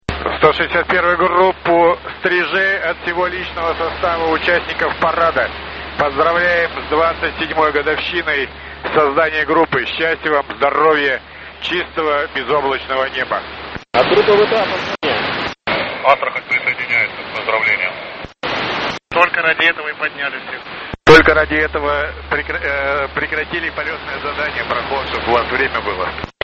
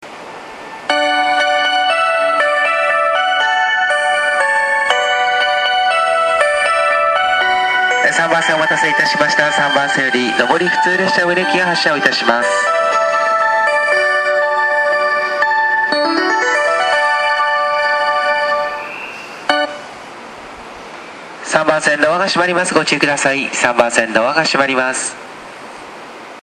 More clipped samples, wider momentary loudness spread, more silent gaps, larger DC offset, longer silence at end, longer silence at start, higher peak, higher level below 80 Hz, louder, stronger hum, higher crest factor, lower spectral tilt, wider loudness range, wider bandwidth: neither; second, 9 LU vs 18 LU; neither; neither; about the same, 0.15 s vs 0.05 s; about the same, 0.1 s vs 0 s; about the same, 0 dBFS vs 0 dBFS; first, -38 dBFS vs -58 dBFS; second, -16 LUFS vs -13 LUFS; neither; about the same, 16 dB vs 14 dB; first, -5 dB/octave vs -2.5 dB/octave; about the same, 4 LU vs 4 LU; second, 8.2 kHz vs 12 kHz